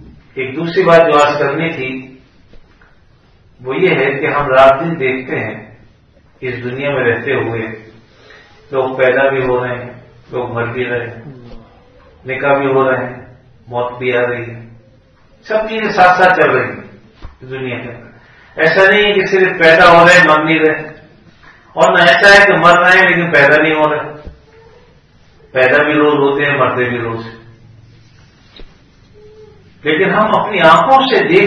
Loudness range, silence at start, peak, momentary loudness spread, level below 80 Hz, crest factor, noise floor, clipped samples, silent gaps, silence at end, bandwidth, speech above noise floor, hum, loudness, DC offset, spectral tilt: 11 LU; 0.05 s; 0 dBFS; 19 LU; -44 dBFS; 14 dB; -47 dBFS; 0.5%; none; 0 s; 12 kHz; 36 dB; none; -11 LUFS; under 0.1%; -5 dB/octave